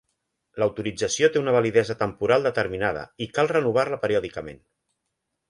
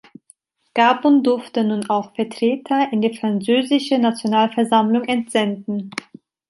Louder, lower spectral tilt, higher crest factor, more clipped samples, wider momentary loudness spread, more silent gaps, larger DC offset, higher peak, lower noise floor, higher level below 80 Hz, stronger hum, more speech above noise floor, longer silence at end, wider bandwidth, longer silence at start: second, -23 LUFS vs -19 LUFS; about the same, -4.5 dB/octave vs -5.5 dB/octave; about the same, 18 dB vs 16 dB; neither; about the same, 11 LU vs 10 LU; neither; neither; second, -6 dBFS vs -2 dBFS; first, -80 dBFS vs -56 dBFS; first, -56 dBFS vs -70 dBFS; neither; first, 56 dB vs 38 dB; first, 0.95 s vs 0.6 s; about the same, 11.5 kHz vs 11.5 kHz; second, 0.55 s vs 0.75 s